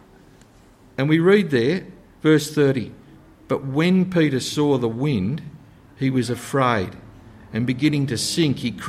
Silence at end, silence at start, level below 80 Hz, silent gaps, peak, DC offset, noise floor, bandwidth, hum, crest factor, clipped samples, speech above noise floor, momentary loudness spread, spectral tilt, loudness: 0 s; 1 s; -54 dBFS; none; -4 dBFS; under 0.1%; -50 dBFS; 15.5 kHz; none; 18 dB; under 0.1%; 31 dB; 10 LU; -6 dB/octave; -21 LUFS